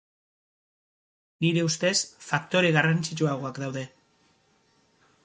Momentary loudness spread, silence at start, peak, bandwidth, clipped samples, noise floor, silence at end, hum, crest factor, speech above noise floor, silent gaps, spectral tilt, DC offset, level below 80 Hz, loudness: 12 LU; 1.4 s; -6 dBFS; 9.4 kHz; under 0.1%; -66 dBFS; 1.4 s; none; 24 dB; 40 dB; none; -4.5 dB/octave; under 0.1%; -70 dBFS; -26 LUFS